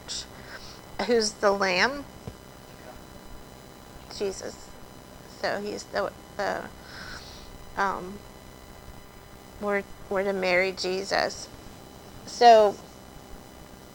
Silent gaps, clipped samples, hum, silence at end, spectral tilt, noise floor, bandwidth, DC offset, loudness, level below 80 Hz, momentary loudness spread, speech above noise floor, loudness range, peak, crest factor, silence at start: none; under 0.1%; none; 0 s; -3.5 dB/octave; -47 dBFS; 19 kHz; under 0.1%; -25 LUFS; -52 dBFS; 24 LU; 22 dB; 12 LU; -6 dBFS; 22 dB; 0 s